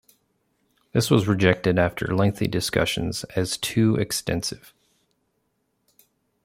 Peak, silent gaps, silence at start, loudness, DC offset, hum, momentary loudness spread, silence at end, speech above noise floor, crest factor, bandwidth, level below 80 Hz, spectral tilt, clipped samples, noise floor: -2 dBFS; none; 0.95 s; -23 LUFS; under 0.1%; none; 7 LU; 1.9 s; 50 dB; 22 dB; 16.5 kHz; -50 dBFS; -5 dB/octave; under 0.1%; -72 dBFS